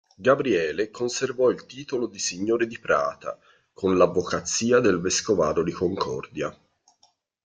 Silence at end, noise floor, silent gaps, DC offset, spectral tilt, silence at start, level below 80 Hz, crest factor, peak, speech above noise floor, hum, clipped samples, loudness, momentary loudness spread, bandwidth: 0.95 s; -65 dBFS; none; under 0.1%; -4 dB/octave; 0.2 s; -60 dBFS; 20 dB; -4 dBFS; 41 dB; none; under 0.1%; -24 LUFS; 12 LU; 9.6 kHz